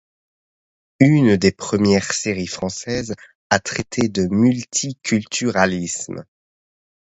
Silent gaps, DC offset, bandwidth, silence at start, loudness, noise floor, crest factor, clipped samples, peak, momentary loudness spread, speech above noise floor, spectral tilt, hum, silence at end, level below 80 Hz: 3.35-3.50 s; under 0.1%; 8.2 kHz; 1 s; -19 LUFS; under -90 dBFS; 20 dB; under 0.1%; 0 dBFS; 11 LU; over 72 dB; -5 dB/octave; none; 0.8 s; -48 dBFS